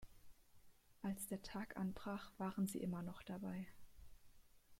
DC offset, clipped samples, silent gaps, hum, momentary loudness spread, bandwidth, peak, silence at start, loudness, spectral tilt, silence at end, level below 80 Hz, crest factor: under 0.1%; under 0.1%; none; none; 7 LU; 16.5 kHz; -32 dBFS; 0 s; -48 LUFS; -6 dB/octave; 0.05 s; -68 dBFS; 16 dB